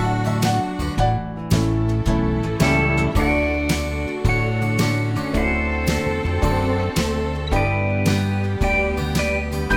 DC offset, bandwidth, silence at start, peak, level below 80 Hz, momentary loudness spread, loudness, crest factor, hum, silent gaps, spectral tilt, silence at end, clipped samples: under 0.1%; 18.5 kHz; 0 s; -4 dBFS; -28 dBFS; 4 LU; -21 LUFS; 16 dB; none; none; -6 dB/octave; 0 s; under 0.1%